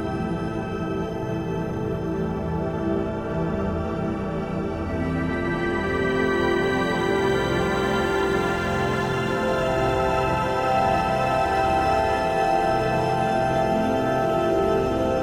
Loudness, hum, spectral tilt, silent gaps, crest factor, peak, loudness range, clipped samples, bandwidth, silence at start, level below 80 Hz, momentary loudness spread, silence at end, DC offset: -23 LUFS; none; -6.5 dB/octave; none; 14 dB; -10 dBFS; 5 LU; under 0.1%; 16 kHz; 0 s; -40 dBFS; 6 LU; 0 s; under 0.1%